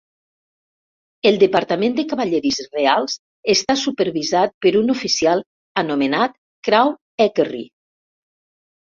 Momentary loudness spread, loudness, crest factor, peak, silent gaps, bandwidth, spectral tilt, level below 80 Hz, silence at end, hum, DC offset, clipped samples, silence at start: 8 LU; -18 LUFS; 18 dB; -2 dBFS; 3.19-3.43 s, 4.54-4.61 s, 5.46-5.75 s, 6.38-6.63 s, 7.01-7.18 s; 7.6 kHz; -3.5 dB/octave; -60 dBFS; 1.2 s; none; under 0.1%; under 0.1%; 1.25 s